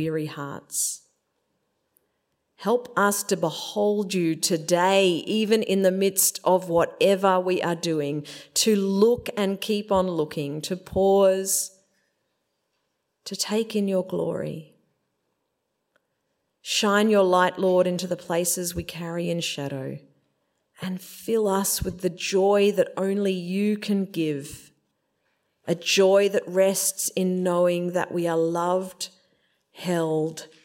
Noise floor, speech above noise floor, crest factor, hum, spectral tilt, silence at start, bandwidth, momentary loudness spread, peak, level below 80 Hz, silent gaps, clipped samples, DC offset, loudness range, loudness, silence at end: -77 dBFS; 54 dB; 18 dB; none; -4 dB/octave; 0 s; 16.5 kHz; 13 LU; -6 dBFS; -56 dBFS; none; under 0.1%; under 0.1%; 7 LU; -24 LUFS; 0.2 s